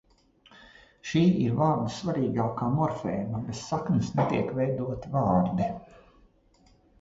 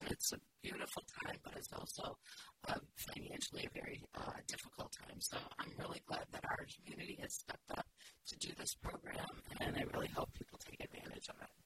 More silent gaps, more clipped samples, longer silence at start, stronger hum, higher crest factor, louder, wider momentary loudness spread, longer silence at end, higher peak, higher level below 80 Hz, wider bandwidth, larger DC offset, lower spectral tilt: neither; neither; first, 0.6 s vs 0 s; neither; second, 18 dB vs 26 dB; first, -27 LUFS vs -47 LUFS; about the same, 8 LU vs 9 LU; first, 1.15 s vs 0.05 s; first, -10 dBFS vs -22 dBFS; first, -54 dBFS vs -64 dBFS; second, 8 kHz vs 16 kHz; neither; first, -7.5 dB/octave vs -3 dB/octave